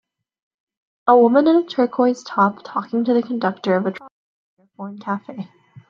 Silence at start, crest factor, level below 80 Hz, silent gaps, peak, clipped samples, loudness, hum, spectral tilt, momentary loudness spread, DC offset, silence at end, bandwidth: 1.05 s; 18 dB; -70 dBFS; 4.12-4.57 s; -2 dBFS; under 0.1%; -18 LUFS; none; -7 dB/octave; 21 LU; under 0.1%; 0.45 s; 7.4 kHz